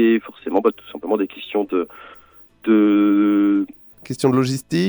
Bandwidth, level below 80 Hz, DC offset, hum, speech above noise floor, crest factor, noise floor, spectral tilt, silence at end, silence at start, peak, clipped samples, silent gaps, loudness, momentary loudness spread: over 20 kHz; -62 dBFS; under 0.1%; none; 28 dB; 14 dB; -46 dBFS; -6.5 dB/octave; 0 s; 0 s; -4 dBFS; under 0.1%; none; -19 LUFS; 13 LU